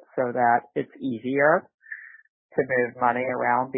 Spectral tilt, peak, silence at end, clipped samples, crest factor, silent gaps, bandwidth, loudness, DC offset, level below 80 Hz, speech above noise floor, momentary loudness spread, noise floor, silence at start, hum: -11 dB/octave; -6 dBFS; 0 s; under 0.1%; 18 dB; 1.74-1.78 s, 2.29-2.49 s; 4 kHz; -24 LUFS; under 0.1%; -68 dBFS; 19 dB; 18 LU; -43 dBFS; 0.15 s; none